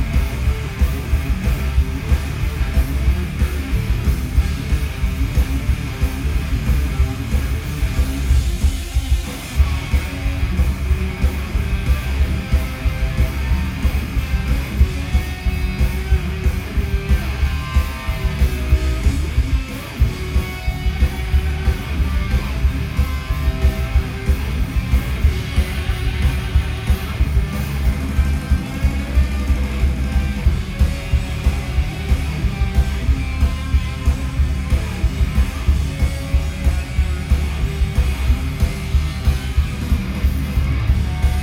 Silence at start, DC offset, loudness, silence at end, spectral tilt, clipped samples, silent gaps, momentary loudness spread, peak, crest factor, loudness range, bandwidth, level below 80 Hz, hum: 0 s; under 0.1%; -21 LUFS; 0 s; -6 dB/octave; under 0.1%; none; 3 LU; -2 dBFS; 14 dB; 1 LU; 16 kHz; -18 dBFS; none